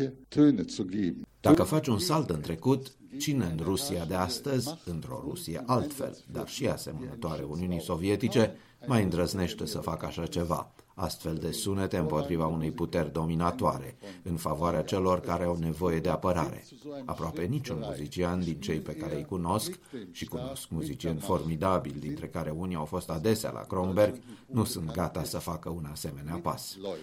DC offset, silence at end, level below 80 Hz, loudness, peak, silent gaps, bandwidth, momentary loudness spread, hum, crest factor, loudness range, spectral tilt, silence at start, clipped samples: under 0.1%; 0 s; -52 dBFS; -31 LUFS; -8 dBFS; none; 16.5 kHz; 10 LU; none; 22 dB; 5 LU; -6 dB/octave; 0 s; under 0.1%